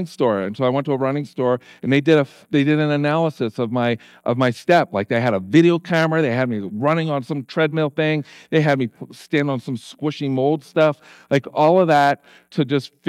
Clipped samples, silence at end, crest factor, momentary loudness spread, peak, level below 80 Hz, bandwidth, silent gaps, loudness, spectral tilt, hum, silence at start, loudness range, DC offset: under 0.1%; 0.2 s; 18 dB; 9 LU; -2 dBFS; -72 dBFS; 13 kHz; none; -19 LUFS; -7 dB/octave; none; 0 s; 3 LU; under 0.1%